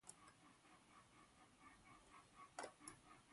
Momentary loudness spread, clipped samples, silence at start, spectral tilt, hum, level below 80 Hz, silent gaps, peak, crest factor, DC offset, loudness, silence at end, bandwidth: 13 LU; under 0.1%; 0 s; -2.5 dB/octave; none; -84 dBFS; none; -36 dBFS; 28 dB; under 0.1%; -63 LUFS; 0 s; 11.5 kHz